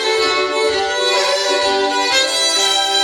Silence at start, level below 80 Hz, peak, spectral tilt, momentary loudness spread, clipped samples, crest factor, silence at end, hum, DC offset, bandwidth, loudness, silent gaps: 0 s; -52 dBFS; -2 dBFS; 0.5 dB/octave; 3 LU; under 0.1%; 14 dB; 0 s; none; under 0.1%; 18.5 kHz; -14 LUFS; none